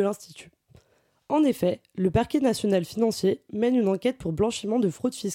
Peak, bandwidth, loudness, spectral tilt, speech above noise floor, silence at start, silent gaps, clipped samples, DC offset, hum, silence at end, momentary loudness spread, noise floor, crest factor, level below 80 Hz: -12 dBFS; 16.5 kHz; -25 LUFS; -6 dB/octave; 41 dB; 0 s; none; under 0.1%; under 0.1%; none; 0 s; 5 LU; -66 dBFS; 14 dB; -52 dBFS